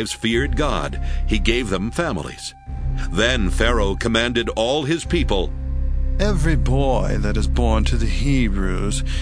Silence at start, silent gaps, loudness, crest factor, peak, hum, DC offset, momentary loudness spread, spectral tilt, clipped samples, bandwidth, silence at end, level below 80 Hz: 0 s; none; -21 LUFS; 18 dB; -2 dBFS; none; under 0.1%; 8 LU; -5 dB/octave; under 0.1%; 11 kHz; 0 s; -22 dBFS